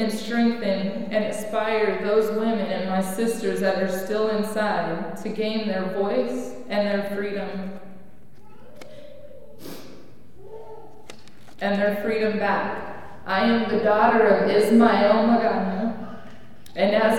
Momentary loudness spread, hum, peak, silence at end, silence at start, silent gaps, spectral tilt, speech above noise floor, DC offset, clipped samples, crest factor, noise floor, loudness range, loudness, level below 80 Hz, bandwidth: 21 LU; none; -4 dBFS; 0 s; 0 s; none; -5.5 dB/octave; 29 dB; 2%; under 0.1%; 20 dB; -51 dBFS; 16 LU; -23 LUFS; -60 dBFS; 16.5 kHz